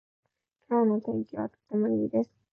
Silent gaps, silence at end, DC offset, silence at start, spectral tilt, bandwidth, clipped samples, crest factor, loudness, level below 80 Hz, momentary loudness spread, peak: none; 0.3 s; under 0.1%; 0.7 s; -11.5 dB/octave; 2.5 kHz; under 0.1%; 14 dB; -29 LUFS; -70 dBFS; 8 LU; -16 dBFS